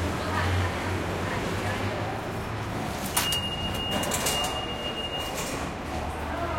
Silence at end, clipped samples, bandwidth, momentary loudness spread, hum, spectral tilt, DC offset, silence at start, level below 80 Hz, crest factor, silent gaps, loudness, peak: 0 s; under 0.1%; 17 kHz; 7 LU; none; -3.5 dB/octave; under 0.1%; 0 s; -44 dBFS; 22 dB; none; -29 LUFS; -6 dBFS